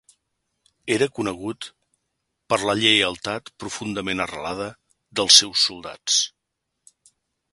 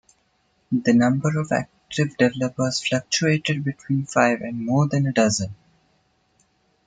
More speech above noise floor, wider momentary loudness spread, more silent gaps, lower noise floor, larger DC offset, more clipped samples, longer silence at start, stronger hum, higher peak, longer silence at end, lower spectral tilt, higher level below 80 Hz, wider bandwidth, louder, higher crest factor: first, 57 dB vs 45 dB; first, 19 LU vs 7 LU; neither; first, -79 dBFS vs -66 dBFS; neither; neither; first, 0.85 s vs 0.7 s; neither; about the same, 0 dBFS vs -2 dBFS; about the same, 1.25 s vs 1.3 s; second, -1.5 dB/octave vs -5 dB/octave; about the same, -58 dBFS vs -60 dBFS; first, 15 kHz vs 9.4 kHz; about the same, -20 LUFS vs -22 LUFS; about the same, 24 dB vs 20 dB